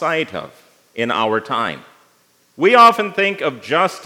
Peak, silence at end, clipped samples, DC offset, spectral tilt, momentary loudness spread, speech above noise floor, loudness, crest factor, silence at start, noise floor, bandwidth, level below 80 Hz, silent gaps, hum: 0 dBFS; 0 s; under 0.1%; under 0.1%; -4.5 dB/octave; 17 LU; 41 dB; -16 LUFS; 18 dB; 0 s; -57 dBFS; 17 kHz; -70 dBFS; none; none